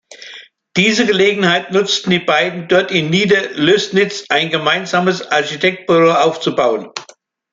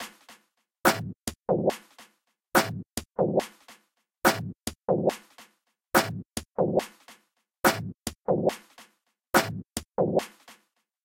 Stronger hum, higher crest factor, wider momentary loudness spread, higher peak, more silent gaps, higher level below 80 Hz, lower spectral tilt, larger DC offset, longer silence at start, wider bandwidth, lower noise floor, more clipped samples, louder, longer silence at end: neither; second, 14 dB vs 22 dB; second, 6 LU vs 11 LU; first, 0 dBFS vs -6 dBFS; neither; about the same, -58 dBFS vs -56 dBFS; about the same, -4.5 dB/octave vs -4 dB/octave; neither; about the same, 0.1 s vs 0 s; second, 7.8 kHz vs 16.5 kHz; second, -45 dBFS vs -68 dBFS; neither; first, -14 LUFS vs -28 LUFS; about the same, 0.5 s vs 0.55 s